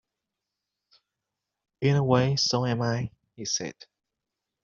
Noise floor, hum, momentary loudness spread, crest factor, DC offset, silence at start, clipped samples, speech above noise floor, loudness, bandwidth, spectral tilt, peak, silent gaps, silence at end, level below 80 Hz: -86 dBFS; none; 15 LU; 22 dB; under 0.1%; 1.8 s; under 0.1%; 61 dB; -26 LUFS; 7.4 kHz; -5 dB/octave; -8 dBFS; none; 0.9 s; -62 dBFS